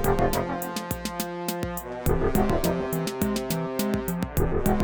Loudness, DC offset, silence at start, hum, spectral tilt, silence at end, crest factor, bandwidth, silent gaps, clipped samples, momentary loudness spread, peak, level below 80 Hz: -27 LUFS; under 0.1%; 0 s; none; -5.5 dB/octave; 0 s; 20 dB; over 20 kHz; none; under 0.1%; 7 LU; -6 dBFS; -34 dBFS